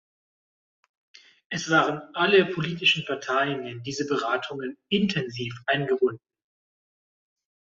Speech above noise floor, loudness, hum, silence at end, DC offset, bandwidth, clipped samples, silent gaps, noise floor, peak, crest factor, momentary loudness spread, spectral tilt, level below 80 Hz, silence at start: over 65 dB; -25 LUFS; none; 1.55 s; under 0.1%; 7.6 kHz; under 0.1%; none; under -90 dBFS; -8 dBFS; 20 dB; 12 LU; -4.5 dB/octave; -66 dBFS; 1.5 s